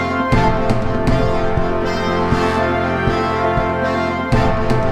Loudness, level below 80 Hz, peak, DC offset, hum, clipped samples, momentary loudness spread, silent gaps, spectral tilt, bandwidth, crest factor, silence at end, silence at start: -17 LUFS; -26 dBFS; -2 dBFS; under 0.1%; none; under 0.1%; 3 LU; none; -7 dB/octave; 12 kHz; 14 dB; 0 s; 0 s